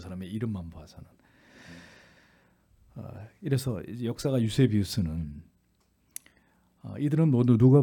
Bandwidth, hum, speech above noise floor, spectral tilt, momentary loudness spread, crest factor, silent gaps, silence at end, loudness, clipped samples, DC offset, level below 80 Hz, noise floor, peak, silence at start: 18 kHz; none; 43 dB; -7.5 dB/octave; 26 LU; 20 dB; none; 0 s; -27 LUFS; under 0.1%; under 0.1%; -56 dBFS; -69 dBFS; -8 dBFS; 0 s